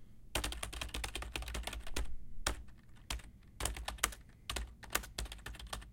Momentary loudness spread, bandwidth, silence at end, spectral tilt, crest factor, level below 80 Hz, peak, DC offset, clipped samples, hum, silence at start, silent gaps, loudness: 10 LU; 17 kHz; 0 s; -2 dB/octave; 34 dB; -46 dBFS; -8 dBFS; under 0.1%; under 0.1%; none; 0 s; none; -42 LUFS